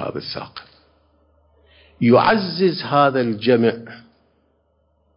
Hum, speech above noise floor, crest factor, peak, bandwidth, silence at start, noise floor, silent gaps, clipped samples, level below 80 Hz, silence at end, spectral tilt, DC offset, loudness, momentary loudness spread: none; 46 dB; 18 dB; -2 dBFS; 5.4 kHz; 0 s; -64 dBFS; none; under 0.1%; -58 dBFS; 1.2 s; -10.5 dB/octave; under 0.1%; -18 LUFS; 20 LU